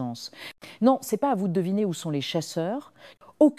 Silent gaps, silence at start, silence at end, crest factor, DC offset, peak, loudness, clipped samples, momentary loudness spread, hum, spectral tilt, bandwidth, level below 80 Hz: none; 0 s; 0.05 s; 20 dB; under 0.1%; -6 dBFS; -26 LUFS; under 0.1%; 15 LU; none; -6 dB/octave; 15.5 kHz; -76 dBFS